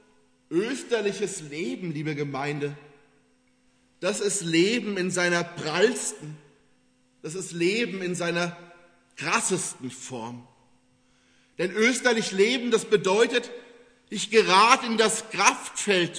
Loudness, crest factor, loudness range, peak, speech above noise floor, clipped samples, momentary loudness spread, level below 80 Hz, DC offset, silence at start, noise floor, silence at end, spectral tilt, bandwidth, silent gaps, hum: -24 LUFS; 24 dB; 9 LU; -2 dBFS; 40 dB; under 0.1%; 15 LU; -76 dBFS; under 0.1%; 0.5 s; -65 dBFS; 0 s; -3 dB/octave; 11 kHz; none; none